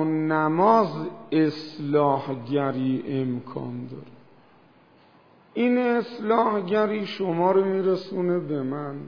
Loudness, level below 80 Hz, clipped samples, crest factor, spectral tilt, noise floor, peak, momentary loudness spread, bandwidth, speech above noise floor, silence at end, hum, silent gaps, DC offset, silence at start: -24 LUFS; -76 dBFS; under 0.1%; 20 dB; -8.5 dB/octave; -56 dBFS; -4 dBFS; 13 LU; 5.4 kHz; 32 dB; 0 s; none; none; 0.2%; 0 s